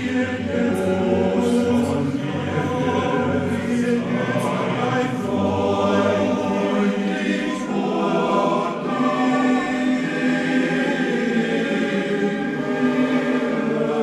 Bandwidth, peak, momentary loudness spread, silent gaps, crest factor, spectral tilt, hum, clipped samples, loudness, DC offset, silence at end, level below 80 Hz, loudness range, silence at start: 12.5 kHz; -6 dBFS; 4 LU; none; 14 dB; -6.5 dB/octave; none; under 0.1%; -21 LUFS; under 0.1%; 0 s; -56 dBFS; 1 LU; 0 s